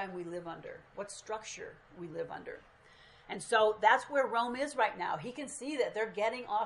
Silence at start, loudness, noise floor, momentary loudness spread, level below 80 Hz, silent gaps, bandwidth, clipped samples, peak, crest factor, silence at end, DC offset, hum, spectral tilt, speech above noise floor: 0 s; -33 LUFS; -60 dBFS; 18 LU; -72 dBFS; none; 11.5 kHz; under 0.1%; -12 dBFS; 24 dB; 0 s; under 0.1%; none; -3 dB/octave; 25 dB